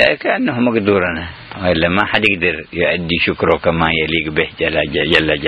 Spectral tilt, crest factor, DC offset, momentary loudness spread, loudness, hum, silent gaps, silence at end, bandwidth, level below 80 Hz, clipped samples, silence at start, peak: -6.5 dB/octave; 16 dB; under 0.1%; 5 LU; -15 LUFS; none; none; 0 s; 11 kHz; -38 dBFS; under 0.1%; 0 s; 0 dBFS